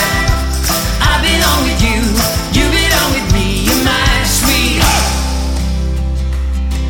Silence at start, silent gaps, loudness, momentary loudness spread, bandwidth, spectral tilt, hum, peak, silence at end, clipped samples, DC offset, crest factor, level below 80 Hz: 0 s; none; -13 LUFS; 7 LU; 19 kHz; -3.5 dB/octave; none; 0 dBFS; 0 s; under 0.1%; under 0.1%; 12 dB; -16 dBFS